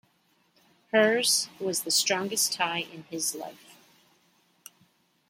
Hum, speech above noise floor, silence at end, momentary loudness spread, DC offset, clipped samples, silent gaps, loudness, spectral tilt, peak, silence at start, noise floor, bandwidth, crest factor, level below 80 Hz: none; 41 dB; 1.55 s; 12 LU; under 0.1%; under 0.1%; none; -26 LUFS; -1.5 dB/octave; -10 dBFS; 0.95 s; -68 dBFS; 16.5 kHz; 20 dB; -82 dBFS